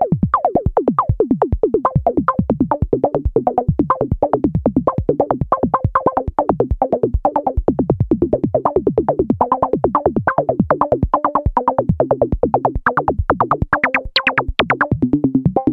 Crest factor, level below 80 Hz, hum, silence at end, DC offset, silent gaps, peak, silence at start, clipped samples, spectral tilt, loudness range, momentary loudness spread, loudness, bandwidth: 16 dB; -28 dBFS; none; 0 s; under 0.1%; none; 0 dBFS; 0 s; under 0.1%; -9.5 dB/octave; 1 LU; 2 LU; -17 LUFS; 6 kHz